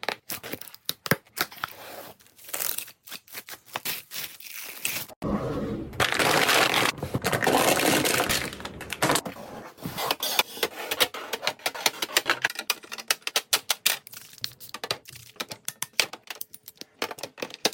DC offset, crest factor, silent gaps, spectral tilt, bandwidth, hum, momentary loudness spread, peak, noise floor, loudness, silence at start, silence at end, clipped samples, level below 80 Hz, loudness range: under 0.1%; 26 dB; 5.16-5.22 s; -2 dB/octave; 17 kHz; none; 17 LU; -4 dBFS; -47 dBFS; -26 LUFS; 0.05 s; 0 s; under 0.1%; -54 dBFS; 10 LU